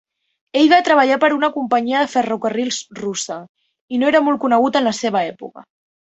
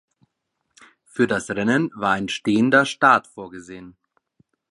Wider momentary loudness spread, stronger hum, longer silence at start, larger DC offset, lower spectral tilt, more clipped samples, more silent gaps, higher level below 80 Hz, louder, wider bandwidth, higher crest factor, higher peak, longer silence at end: second, 12 LU vs 21 LU; neither; second, 0.55 s vs 1.15 s; neither; second, -3.5 dB/octave vs -5 dB/octave; neither; first, 3.49-3.55 s, 3.81-3.88 s vs none; about the same, -64 dBFS vs -60 dBFS; about the same, -17 LUFS vs -19 LUFS; second, 8.2 kHz vs 11.5 kHz; about the same, 16 dB vs 20 dB; about the same, -2 dBFS vs -2 dBFS; second, 0.55 s vs 0.8 s